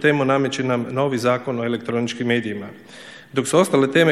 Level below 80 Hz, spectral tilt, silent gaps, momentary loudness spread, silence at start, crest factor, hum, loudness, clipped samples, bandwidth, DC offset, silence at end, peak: -64 dBFS; -5 dB/octave; none; 17 LU; 0 s; 18 dB; none; -20 LUFS; under 0.1%; 14.5 kHz; 0.1%; 0 s; -2 dBFS